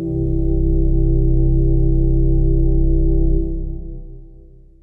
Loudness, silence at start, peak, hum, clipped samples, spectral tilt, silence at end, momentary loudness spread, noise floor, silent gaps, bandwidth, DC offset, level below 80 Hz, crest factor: -19 LUFS; 0 s; -4 dBFS; none; under 0.1%; -14 dB/octave; 0.5 s; 11 LU; -42 dBFS; none; 0.8 kHz; under 0.1%; -16 dBFS; 10 dB